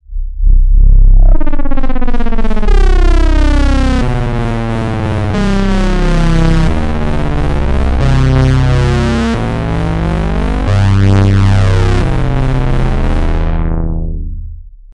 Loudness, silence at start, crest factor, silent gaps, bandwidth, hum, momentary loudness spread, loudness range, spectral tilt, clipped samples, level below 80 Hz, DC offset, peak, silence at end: -13 LUFS; 0.1 s; 8 dB; none; 9 kHz; none; 8 LU; 2 LU; -7.5 dB/octave; under 0.1%; -10 dBFS; under 0.1%; 0 dBFS; 0.25 s